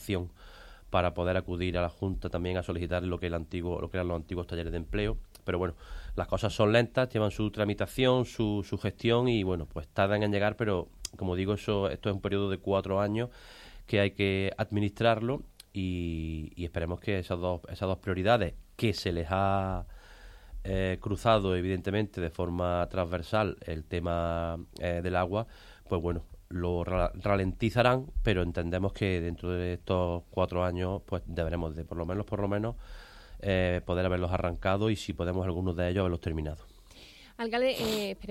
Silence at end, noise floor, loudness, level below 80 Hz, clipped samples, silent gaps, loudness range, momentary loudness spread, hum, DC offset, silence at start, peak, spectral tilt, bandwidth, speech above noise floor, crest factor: 0 s; -53 dBFS; -31 LUFS; -44 dBFS; under 0.1%; none; 4 LU; 10 LU; none; under 0.1%; 0 s; -10 dBFS; -6.5 dB/octave; 15 kHz; 23 dB; 20 dB